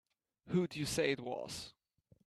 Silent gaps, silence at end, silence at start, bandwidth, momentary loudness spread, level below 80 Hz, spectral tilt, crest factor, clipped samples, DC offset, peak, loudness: none; 0.55 s; 0.45 s; 14 kHz; 11 LU; -66 dBFS; -4.5 dB/octave; 18 dB; under 0.1%; under 0.1%; -20 dBFS; -38 LUFS